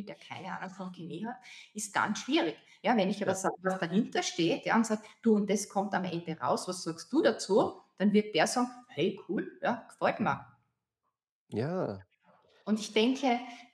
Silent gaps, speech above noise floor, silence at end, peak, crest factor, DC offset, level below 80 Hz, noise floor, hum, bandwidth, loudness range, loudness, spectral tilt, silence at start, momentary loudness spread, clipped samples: 11.31-11.47 s; 54 dB; 0.1 s; -12 dBFS; 20 dB; under 0.1%; -82 dBFS; -85 dBFS; none; 13.5 kHz; 5 LU; -31 LUFS; -4.5 dB/octave; 0 s; 12 LU; under 0.1%